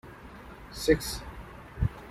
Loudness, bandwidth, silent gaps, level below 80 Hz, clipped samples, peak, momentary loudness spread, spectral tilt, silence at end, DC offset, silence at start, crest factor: -30 LUFS; 16 kHz; none; -42 dBFS; under 0.1%; -10 dBFS; 20 LU; -5 dB/octave; 0 s; under 0.1%; 0.05 s; 22 dB